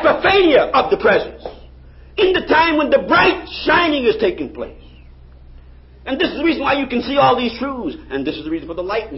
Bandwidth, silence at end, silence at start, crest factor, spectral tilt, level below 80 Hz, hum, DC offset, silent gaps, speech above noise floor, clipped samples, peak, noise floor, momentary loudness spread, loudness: 5.8 kHz; 0 s; 0 s; 16 dB; -9 dB/octave; -40 dBFS; none; under 0.1%; none; 25 dB; under 0.1%; -2 dBFS; -41 dBFS; 15 LU; -16 LUFS